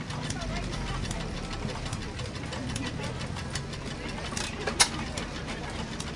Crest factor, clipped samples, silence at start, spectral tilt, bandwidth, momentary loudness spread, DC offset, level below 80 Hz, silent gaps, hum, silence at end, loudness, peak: 30 dB; under 0.1%; 0 s; -3.5 dB/octave; 11.5 kHz; 11 LU; under 0.1%; -42 dBFS; none; none; 0 s; -32 LUFS; -4 dBFS